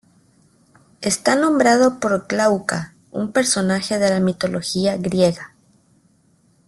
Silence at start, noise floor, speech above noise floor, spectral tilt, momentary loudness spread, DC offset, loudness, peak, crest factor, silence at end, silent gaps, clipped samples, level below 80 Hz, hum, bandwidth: 1 s; -58 dBFS; 40 dB; -4.5 dB/octave; 12 LU; under 0.1%; -19 LUFS; -2 dBFS; 18 dB; 1.2 s; none; under 0.1%; -56 dBFS; none; 12.5 kHz